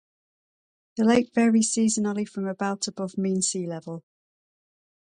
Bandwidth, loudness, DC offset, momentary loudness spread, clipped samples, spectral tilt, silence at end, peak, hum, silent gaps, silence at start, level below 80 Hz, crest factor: 11 kHz; -24 LUFS; under 0.1%; 14 LU; under 0.1%; -4.5 dB/octave; 1.15 s; -8 dBFS; none; none; 0.95 s; -68 dBFS; 18 dB